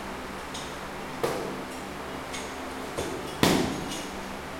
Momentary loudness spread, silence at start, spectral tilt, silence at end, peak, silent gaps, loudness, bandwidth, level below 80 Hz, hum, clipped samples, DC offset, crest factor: 12 LU; 0 s; -4 dB/octave; 0 s; -2 dBFS; none; -31 LUFS; 16.5 kHz; -50 dBFS; none; under 0.1%; under 0.1%; 30 dB